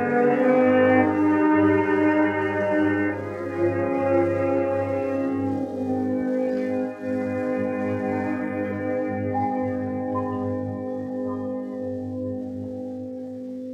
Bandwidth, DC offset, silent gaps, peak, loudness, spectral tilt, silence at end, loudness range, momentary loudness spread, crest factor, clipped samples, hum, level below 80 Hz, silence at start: 7.6 kHz; under 0.1%; none; -6 dBFS; -24 LUFS; -8.5 dB/octave; 0 s; 8 LU; 12 LU; 18 dB; under 0.1%; none; -66 dBFS; 0 s